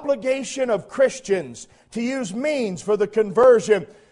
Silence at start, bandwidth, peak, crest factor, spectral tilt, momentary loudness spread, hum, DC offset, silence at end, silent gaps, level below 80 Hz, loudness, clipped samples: 0 s; 11 kHz; -4 dBFS; 16 dB; -4.5 dB/octave; 12 LU; none; under 0.1%; 0.25 s; none; -60 dBFS; -21 LUFS; under 0.1%